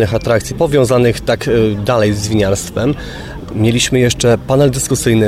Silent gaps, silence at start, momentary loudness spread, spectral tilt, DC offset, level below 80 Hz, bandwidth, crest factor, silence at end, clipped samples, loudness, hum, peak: none; 0 s; 6 LU; -5 dB/octave; under 0.1%; -32 dBFS; 16 kHz; 12 dB; 0 s; under 0.1%; -13 LUFS; none; -2 dBFS